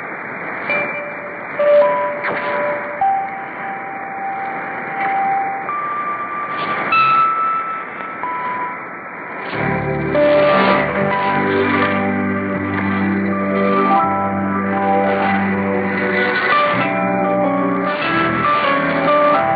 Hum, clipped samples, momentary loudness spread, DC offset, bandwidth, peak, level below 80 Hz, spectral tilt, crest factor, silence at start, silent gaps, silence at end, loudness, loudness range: none; under 0.1%; 12 LU; under 0.1%; 5 kHz; -2 dBFS; -52 dBFS; -11 dB/octave; 16 dB; 0 s; none; 0 s; -17 LUFS; 5 LU